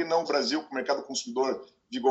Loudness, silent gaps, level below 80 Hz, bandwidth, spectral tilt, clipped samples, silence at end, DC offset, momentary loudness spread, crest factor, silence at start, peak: -29 LUFS; none; -76 dBFS; 8.4 kHz; -2.5 dB/octave; under 0.1%; 0 s; under 0.1%; 8 LU; 18 dB; 0 s; -12 dBFS